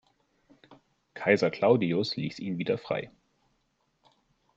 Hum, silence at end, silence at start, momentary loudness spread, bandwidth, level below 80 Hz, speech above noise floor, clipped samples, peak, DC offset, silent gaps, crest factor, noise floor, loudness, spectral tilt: none; 1.5 s; 0.7 s; 10 LU; 7.8 kHz; -70 dBFS; 47 dB; under 0.1%; -6 dBFS; under 0.1%; none; 24 dB; -74 dBFS; -28 LUFS; -6.5 dB/octave